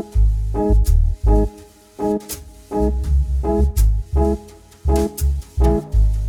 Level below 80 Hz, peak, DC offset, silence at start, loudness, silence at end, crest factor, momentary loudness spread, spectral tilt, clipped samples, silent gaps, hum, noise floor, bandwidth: -18 dBFS; -4 dBFS; under 0.1%; 0 s; -20 LUFS; 0 s; 12 dB; 8 LU; -7.5 dB/octave; under 0.1%; none; none; -42 dBFS; 17 kHz